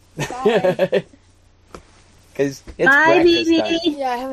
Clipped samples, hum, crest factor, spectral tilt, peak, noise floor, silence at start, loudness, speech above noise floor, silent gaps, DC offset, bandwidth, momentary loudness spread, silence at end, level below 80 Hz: under 0.1%; none; 16 dB; -4.5 dB/octave; -2 dBFS; -52 dBFS; 0.15 s; -17 LUFS; 35 dB; none; under 0.1%; 13.5 kHz; 12 LU; 0 s; -50 dBFS